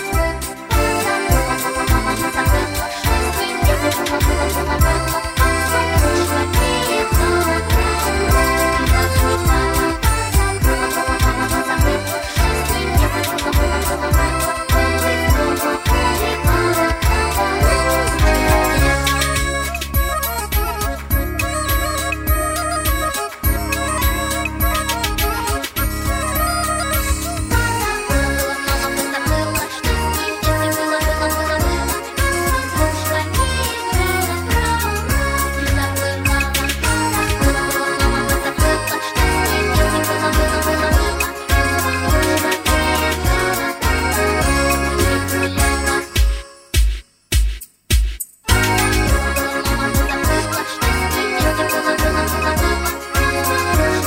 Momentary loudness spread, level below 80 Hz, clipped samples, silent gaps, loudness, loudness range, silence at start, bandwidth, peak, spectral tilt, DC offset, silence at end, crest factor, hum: 4 LU; -22 dBFS; under 0.1%; none; -17 LUFS; 3 LU; 0 s; 16.5 kHz; 0 dBFS; -4 dB/octave; under 0.1%; 0 s; 16 dB; none